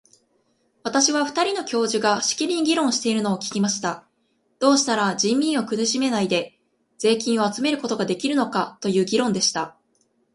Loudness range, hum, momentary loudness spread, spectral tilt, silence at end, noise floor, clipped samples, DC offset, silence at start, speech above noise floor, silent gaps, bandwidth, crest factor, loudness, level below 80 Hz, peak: 2 LU; none; 6 LU; -3 dB/octave; 0.65 s; -68 dBFS; under 0.1%; under 0.1%; 0.85 s; 46 dB; none; 11.5 kHz; 18 dB; -22 LUFS; -68 dBFS; -4 dBFS